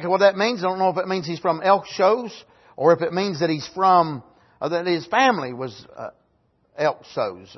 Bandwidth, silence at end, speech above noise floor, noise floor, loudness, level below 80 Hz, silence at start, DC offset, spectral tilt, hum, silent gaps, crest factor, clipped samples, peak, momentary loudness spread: 6.2 kHz; 0.1 s; 44 dB; -65 dBFS; -21 LUFS; -68 dBFS; 0 s; under 0.1%; -5.5 dB/octave; none; none; 18 dB; under 0.1%; -4 dBFS; 16 LU